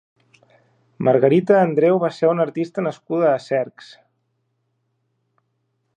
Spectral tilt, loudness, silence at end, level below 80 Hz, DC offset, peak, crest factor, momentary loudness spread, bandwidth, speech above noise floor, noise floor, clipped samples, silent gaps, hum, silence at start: -8 dB/octave; -18 LUFS; 2.3 s; -70 dBFS; under 0.1%; -2 dBFS; 18 dB; 9 LU; 9.4 kHz; 53 dB; -71 dBFS; under 0.1%; none; none; 1 s